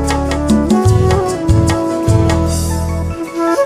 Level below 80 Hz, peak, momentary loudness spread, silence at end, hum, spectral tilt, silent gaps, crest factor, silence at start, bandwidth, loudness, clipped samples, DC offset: -22 dBFS; 0 dBFS; 7 LU; 0 s; none; -6.5 dB/octave; none; 12 dB; 0 s; 15.5 kHz; -14 LUFS; under 0.1%; under 0.1%